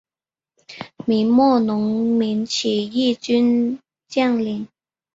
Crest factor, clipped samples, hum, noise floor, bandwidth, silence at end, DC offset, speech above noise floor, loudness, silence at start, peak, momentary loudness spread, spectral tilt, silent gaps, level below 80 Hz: 16 dB; under 0.1%; none; under -90 dBFS; 7.8 kHz; 0.5 s; under 0.1%; over 72 dB; -19 LUFS; 0.7 s; -4 dBFS; 15 LU; -5 dB/octave; none; -62 dBFS